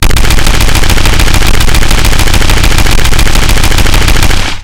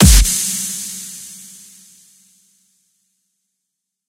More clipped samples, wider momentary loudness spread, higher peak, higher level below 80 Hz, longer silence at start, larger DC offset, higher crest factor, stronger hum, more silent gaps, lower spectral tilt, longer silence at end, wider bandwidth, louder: first, 10% vs under 0.1%; second, 1 LU vs 26 LU; about the same, 0 dBFS vs 0 dBFS; first, -6 dBFS vs -22 dBFS; about the same, 0 s vs 0 s; first, 5% vs under 0.1%; second, 4 dB vs 18 dB; neither; neither; about the same, -3.5 dB/octave vs -3.5 dB/octave; second, 0 s vs 2.7 s; about the same, 17 kHz vs 16.5 kHz; first, -8 LUFS vs -16 LUFS